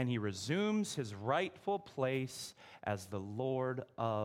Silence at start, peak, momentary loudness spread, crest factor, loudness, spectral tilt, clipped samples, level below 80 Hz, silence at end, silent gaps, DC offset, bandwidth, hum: 0 s; -18 dBFS; 8 LU; 18 dB; -38 LUFS; -5.5 dB/octave; under 0.1%; -76 dBFS; 0 s; none; under 0.1%; 16.5 kHz; none